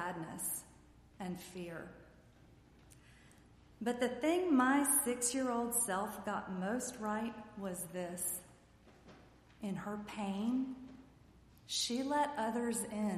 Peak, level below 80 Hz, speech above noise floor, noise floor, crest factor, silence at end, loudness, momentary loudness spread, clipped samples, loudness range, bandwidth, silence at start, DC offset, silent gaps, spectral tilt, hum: -18 dBFS; -68 dBFS; 26 dB; -63 dBFS; 20 dB; 0 s; -37 LUFS; 15 LU; under 0.1%; 11 LU; 15 kHz; 0 s; under 0.1%; none; -3.5 dB/octave; none